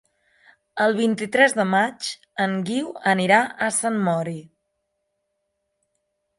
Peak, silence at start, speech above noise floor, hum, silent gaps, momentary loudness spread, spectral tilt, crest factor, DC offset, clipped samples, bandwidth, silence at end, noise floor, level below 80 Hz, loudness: -4 dBFS; 0.75 s; 55 dB; none; none; 12 LU; -4 dB/octave; 20 dB; under 0.1%; under 0.1%; 11.5 kHz; 1.95 s; -76 dBFS; -72 dBFS; -21 LUFS